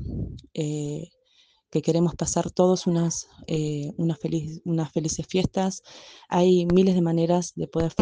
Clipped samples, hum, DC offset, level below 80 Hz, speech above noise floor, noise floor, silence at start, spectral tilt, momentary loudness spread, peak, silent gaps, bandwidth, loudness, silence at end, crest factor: under 0.1%; none; under 0.1%; -48 dBFS; 38 dB; -62 dBFS; 0 s; -6 dB/octave; 13 LU; -8 dBFS; none; 10 kHz; -25 LUFS; 0 s; 18 dB